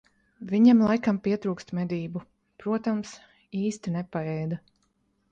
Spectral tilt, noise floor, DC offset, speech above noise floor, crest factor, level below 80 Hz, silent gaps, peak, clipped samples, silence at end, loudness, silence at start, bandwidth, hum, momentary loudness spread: -7.5 dB/octave; -71 dBFS; under 0.1%; 46 dB; 20 dB; -64 dBFS; none; -8 dBFS; under 0.1%; 0.75 s; -26 LUFS; 0.4 s; 8.6 kHz; none; 18 LU